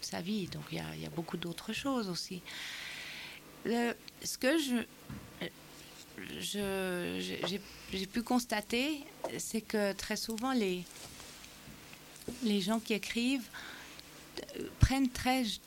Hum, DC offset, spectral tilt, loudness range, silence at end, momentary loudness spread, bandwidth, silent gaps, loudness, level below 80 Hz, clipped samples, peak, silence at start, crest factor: none; under 0.1%; -4.5 dB/octave; 4 LU; 0 s; 16 LU; 17 kHz; none; -36 LUFS; -52 dBFS; under 0.1%; -10 dBFS; 0 s; 26 dB